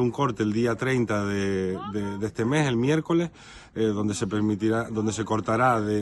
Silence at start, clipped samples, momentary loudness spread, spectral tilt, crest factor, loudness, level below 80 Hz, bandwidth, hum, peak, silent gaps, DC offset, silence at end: 0 s; under 0.1%; 7 LU; -6 dB/octave; 16 dB; -25 LUFS; -56 dBFS; 12 kHz; none; -8 dBFS; none; under 0.1%; 0 s